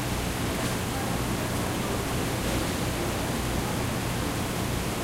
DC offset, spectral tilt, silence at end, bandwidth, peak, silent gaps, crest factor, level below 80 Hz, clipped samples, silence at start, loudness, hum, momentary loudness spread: under 0.1%; -4.5 dB/octave; 0 s; 16 kHz; -16 dBFS; none; 12 dB; -38 dBFS; under 0.1%; 0 s; -29 LUFS; none; 1 LU